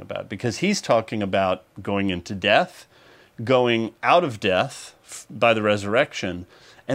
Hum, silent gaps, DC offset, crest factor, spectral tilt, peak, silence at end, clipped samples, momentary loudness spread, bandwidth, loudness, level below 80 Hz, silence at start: none; none; under 0.1%; 22 dB; -4.5 dB/octave; -2 dBFS; 0 s; under 0.1%; 15 LU; 15.5 kHz; -22 LUFS; -60 dBFS; 0 s